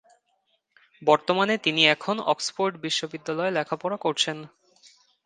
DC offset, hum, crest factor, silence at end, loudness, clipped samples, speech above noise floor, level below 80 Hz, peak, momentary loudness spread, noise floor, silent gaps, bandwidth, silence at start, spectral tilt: under 0.1%; none; 24 dB; 0.8 s; -24 LUFS; under 0.1%; 47 dB; -74 dBFS; -2 dBFS; 9 LU; -72 dBFS; none; 9.8 kHz; 1 s; -3 dB/octave